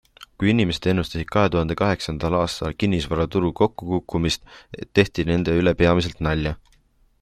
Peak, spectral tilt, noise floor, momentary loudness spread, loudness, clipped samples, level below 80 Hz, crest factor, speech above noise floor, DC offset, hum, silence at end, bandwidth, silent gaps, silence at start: -2 dBFS; -6.5 dB/octave; -59 dBFS; 6 LU; -22 LUFS; under 0.1%; -40 dBFS; 20 dB; 38 dB; under 0.1%; none; 0.65 s; 13.5 kHz; none; 0.2 s